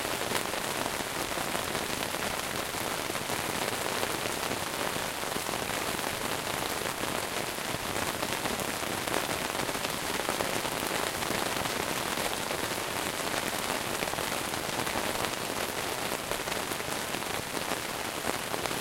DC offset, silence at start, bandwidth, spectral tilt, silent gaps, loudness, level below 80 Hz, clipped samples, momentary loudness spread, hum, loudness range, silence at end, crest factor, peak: under 0.1%; 0 s; 17 kHz; -2 dB/octave; none; -31 LUFS; -54 dBFS; under 0.1%; 2 LU; none; 1 LU; 0 s; 26 dB; -6 dBFS